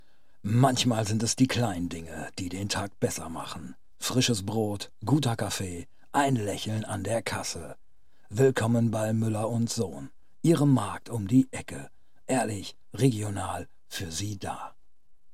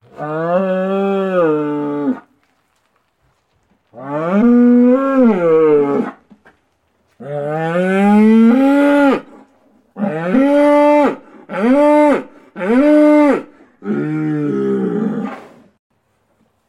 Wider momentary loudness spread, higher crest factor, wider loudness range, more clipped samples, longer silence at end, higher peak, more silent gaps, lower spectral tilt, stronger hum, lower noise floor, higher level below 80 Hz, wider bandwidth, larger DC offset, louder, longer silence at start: about the same, 15 LU vs 14 LU; first, 22 dB vs 12 dB; second, 4 LU vs 7 LU; neither; second, 0.65 s vs 1.3 s; second, -8 dBFS vs -2 dBFS; neither; second, -5 dB/octave vs -8 dB/octave; neither; about the same, -64 dBFS vs -62 dBFS; about the same, -60 dBFS vs -56 dBFS; first, 16 kHz vs 11 kHz; first, 0.5% vs under 0.1%; second, -28 LUFS vs -13 LUFS; first, 0.45 s vs 0.2 s